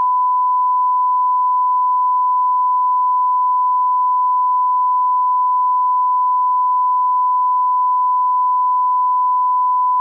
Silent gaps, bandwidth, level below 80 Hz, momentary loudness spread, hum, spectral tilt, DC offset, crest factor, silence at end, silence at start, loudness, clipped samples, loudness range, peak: none; 1.2 kHz; under -90 dBFS; 0 LU; none; 8.5 dB/octave; under 0.1%; 4 dB; 0 s; 0 s; -15 LUFS; under 0.1%; 0 LU; -12 dBFS